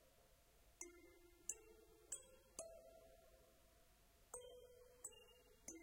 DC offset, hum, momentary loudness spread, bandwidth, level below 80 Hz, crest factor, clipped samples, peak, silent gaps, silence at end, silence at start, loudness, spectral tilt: under 0.1%; none; 16 LU; 16 kHz; -76 dBFS; 34 dB; under 0.1%; -28 dBFS; none; 0 s; 0 s; -57 LUFS; -1.5 dB/octave